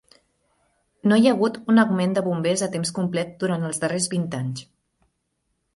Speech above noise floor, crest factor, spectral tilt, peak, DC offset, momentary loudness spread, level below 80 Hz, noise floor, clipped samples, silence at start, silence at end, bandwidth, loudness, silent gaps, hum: 53 dB; 18 dB; -5 dB/octave; -6 dBFS; under 0.1%; 9 LU; -64 dBFS; -74 dBFS; under 0.1%; 1.05 s; 1.15 s; 11.5 kHz; -22 LUFS; none; none